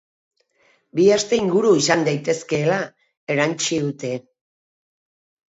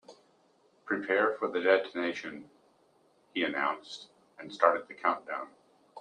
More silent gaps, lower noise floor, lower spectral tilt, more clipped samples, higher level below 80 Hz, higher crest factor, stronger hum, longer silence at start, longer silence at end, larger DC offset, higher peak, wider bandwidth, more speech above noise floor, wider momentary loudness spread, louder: first, 3.17-3.27 s vs none; second, -61 dBFS vs -67 dBFS; about the same, -4.5 dB/octave vs -4.5 dB/octave; neither; first, -64 dBFS vs -82 dBFS; second, 20 dB vs 26 dB; neither; first, 0.95 s vs 0.1 s; first, 1.3 s vs 0 s; neither; first, -2 dBFS vs -8 dBFS; second, 8 kHz vs 9.8 kHz; first, 42 dB vs 36 dB; second, 13 LU vs 19 LU; first, -20 LUFS vs -30 LUFS